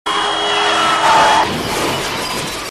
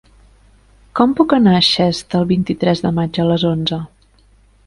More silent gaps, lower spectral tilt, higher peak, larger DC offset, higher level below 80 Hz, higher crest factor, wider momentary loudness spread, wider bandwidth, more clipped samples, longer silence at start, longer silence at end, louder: neither; second, -2 dB/octave vs -6.5 dB/octave; about the same, 0 dBFS vs 0 dBFS; first, 0.3% vs under 0.1%; about the same, -42 dBFS vs -46 dBFS; about the same, 14 dB vs 16 dB; about the same, 9 LU vs 10 LU; first, 14.5 kHz vs 11.5 kHz; neither; second, 0.05 s vs 0.95 s; second, 0 s vs 0.8 s; about the same, -14 LUFS vs -15 LUFS